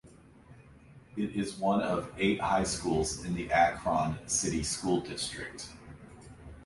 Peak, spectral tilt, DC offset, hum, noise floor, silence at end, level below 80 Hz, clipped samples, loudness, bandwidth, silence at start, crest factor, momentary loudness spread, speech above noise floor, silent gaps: -14 dBFS; -4 dB/octave; under 0.1%; none; -55 dBFS; 0 s; -52 dBFS; under 0.1%; -31 LUFS; 11.5 kHz; 0.05 s; 20 dB; 21 LU; 24 dB; none